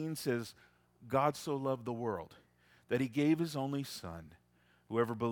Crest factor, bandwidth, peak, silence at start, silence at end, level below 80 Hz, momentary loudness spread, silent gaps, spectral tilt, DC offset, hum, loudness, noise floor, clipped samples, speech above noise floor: 20 dB; 18 kHz; -16 dBFS; 0 s; 0 s; -70 dBFS; 13 LU; none; -6 dB/octave; under 0.1%; 60 Hz at -65 dBFS; -36 LUFS; -70 dBFS; under 0.1%; 35 dB